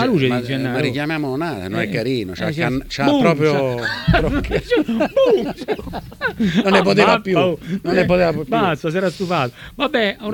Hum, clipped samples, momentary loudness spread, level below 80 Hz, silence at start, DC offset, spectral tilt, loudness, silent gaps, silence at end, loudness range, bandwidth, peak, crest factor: none; under 0.1%; 9 LU; -36 dBFS; 0 s; under 0.1%; -6.5 dB/octave; -18 LUFS; none; 0 s; 3 LU; 19 kHz; 0 dBFS; 18 dB